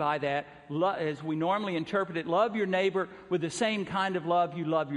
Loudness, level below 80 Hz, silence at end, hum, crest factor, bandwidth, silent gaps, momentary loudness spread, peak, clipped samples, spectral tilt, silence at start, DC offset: -30 LUFS; -70 dBFS; 0 s; none; 16 dB; 11.5 kHz; none; 5 LU; -14 dBFS; under 0.1%; -5.5 dB/octave; 0 s; under 0.1%